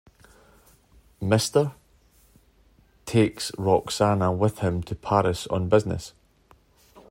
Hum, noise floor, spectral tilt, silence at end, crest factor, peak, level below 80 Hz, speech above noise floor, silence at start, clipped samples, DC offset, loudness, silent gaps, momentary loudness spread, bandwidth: none; -59 dBFS; -6 dB/octave; 1 s; 22 dB; -4 dBFS; -52 dBFS; 36 dB; 1.2 s; under 0.1%; under 0.1%; -24 LUFS; none; 10 LU; 16 kHz